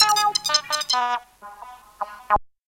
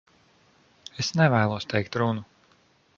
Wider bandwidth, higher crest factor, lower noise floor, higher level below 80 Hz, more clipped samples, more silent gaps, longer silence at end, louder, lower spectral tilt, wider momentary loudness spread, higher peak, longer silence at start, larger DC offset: first, 17 kHz vs 7.4 kHz; about the same, 22 dB vs 20 dB; second, -43 dBFS vs -62 dBFS; first, -46 dBFS vs -58 dBFS; neither; neither; second, 0.3 s vs 0.75 s; first, -21 LUFS vs -25 LUFS; second, 1 dB/octave vs -5.5 dB/octave; first, 22 LU vs 17 LU; first, -2 dBFS vs -6 dBFS; second, 0 s vs 0.95 s; neither